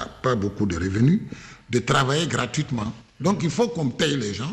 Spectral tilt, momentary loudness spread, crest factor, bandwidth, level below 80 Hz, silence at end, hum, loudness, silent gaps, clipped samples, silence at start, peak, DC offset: -5.5 dB/octave; 8 LU; 14 dB; 12.5 kHz; -50 dBFS; 0 s; none; -23 LUFS; none; under 0.1%; 0 s; -8 dBFS; under 0.1%